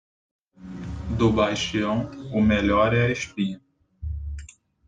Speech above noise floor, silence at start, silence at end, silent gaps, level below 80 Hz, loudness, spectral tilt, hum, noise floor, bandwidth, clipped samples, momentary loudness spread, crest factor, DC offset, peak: 22 dB; 0.6 s; 0.4 s; none; -40 dBFS; -24 LUFS; -6 dB/octave; none; -44 dBFS; 9.2 kHz; under 0.1%; 18 LU; 18 dB; under 0.1%; -6 dBFS